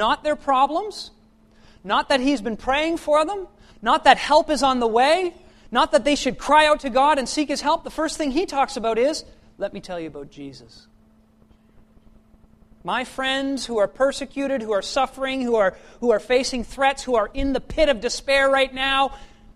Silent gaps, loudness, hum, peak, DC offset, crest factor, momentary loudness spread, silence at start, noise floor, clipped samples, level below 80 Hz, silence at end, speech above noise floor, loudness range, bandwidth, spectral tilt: none; -21 LUFS; none; 0 dBFS; under 0.1%; 22 dB; 14 LU; 0 s; -55 dBFS; under 0.1%; -42 dBFS; 0.3 s; 34 dB; 11 LU; 13 kHz; -3 dB/octave